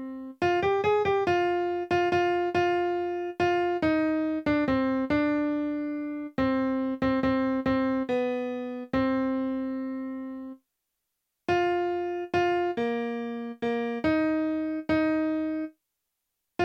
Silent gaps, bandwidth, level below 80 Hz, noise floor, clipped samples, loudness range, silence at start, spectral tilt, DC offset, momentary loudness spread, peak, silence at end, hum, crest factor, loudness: none; 7.4 kHz; -56 dBFS; -82 dBFS; under 0.1%; 4 LU; 0 s; -7 dB/octave; under 0.1%; 9 LU; -12 dBFS; 0 s; none; 14 dB; -27 LUFS